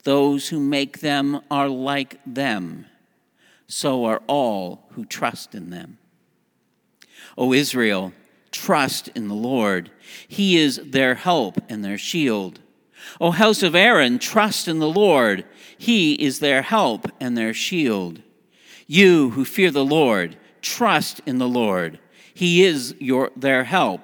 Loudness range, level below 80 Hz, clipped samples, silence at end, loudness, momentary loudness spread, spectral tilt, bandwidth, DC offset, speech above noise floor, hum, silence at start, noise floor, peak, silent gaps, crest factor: 8 LU; -70 dBFS; under 0.1%; 0.05 s; -19 LUFS; 14 LU; -4.5 dB/octave; over 20 kHz; under 0.1%; 47 dB; none; 0.05 s; -67 dBFS; 0 dBFS; none; 20 dB